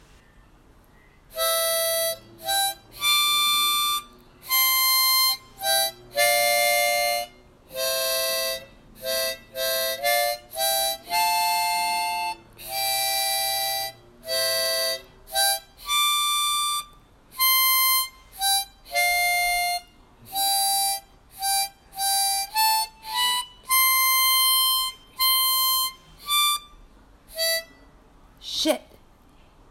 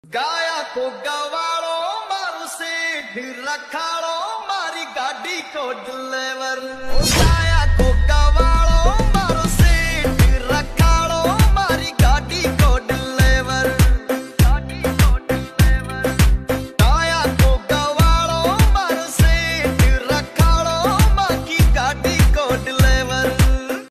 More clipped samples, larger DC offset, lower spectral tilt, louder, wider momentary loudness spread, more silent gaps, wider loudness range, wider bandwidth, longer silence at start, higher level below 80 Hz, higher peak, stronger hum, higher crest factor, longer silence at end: neither; neither; second, 1.5 dB/octave vs -5 dB/octave; second, -22 LUFS vs -18 LUFS; first, 12 LU vs 9 LU; neither; about the same, 5 LU vs 7 LU; first, 16.5 kHz vs 14 kHz; first, 1.35 s vs 0.1 s; second, -56 dBFS vs -20 dBFS; second, -8 dBFS vs -2 dBFS; neither; about the same, 16 dB vs 14 dB; first, 0.9 s vs 0.05 s